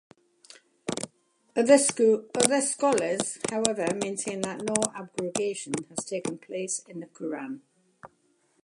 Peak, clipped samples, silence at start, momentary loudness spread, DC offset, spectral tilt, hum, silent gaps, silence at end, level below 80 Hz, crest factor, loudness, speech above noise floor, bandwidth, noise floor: 0 dBFS; under 0.1%; 0.85 s; 14 LU; under 0.1%; -3 dB/octave; none; none; 0.6 s; -70 dBFS; 28 dB; -27 LUFS; 42 dB; 14.5 kHz; -68 dBFS